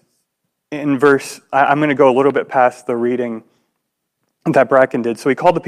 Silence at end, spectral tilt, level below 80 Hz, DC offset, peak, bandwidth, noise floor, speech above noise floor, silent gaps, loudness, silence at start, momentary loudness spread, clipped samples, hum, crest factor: 0 s; -6 dB/octave; -60 dBFS; under 0.1%; 0 dBFS; 14 kHz; -74 dBFS; 59 dB; none; -15 LUFS; 0.7 s; 11 LU; under 0.1%; none; 16 dB